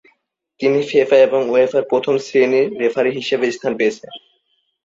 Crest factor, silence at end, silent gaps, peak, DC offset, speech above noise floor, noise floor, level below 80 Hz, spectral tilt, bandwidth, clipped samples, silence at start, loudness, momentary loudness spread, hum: 16 dB; 0.65 s; none; -2 dBFS; under 0.1%; 50 dB; -66 dBFS; -64 dBFS; -5 dB/octave; 7.8 kHz; under 0.1%; 0.6 s; -16 LUFS; 7 LU; none